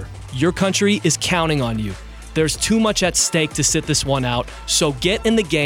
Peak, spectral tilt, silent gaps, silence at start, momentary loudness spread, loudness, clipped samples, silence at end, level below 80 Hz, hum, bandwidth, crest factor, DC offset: -6 dBFS; -3.5 dB/octave; none; 0 s; 8 LU; -18 LUFS; under 0.1%; 0 s; -36 dBFS; none; 17 kHz; 14 dB; under 0.1%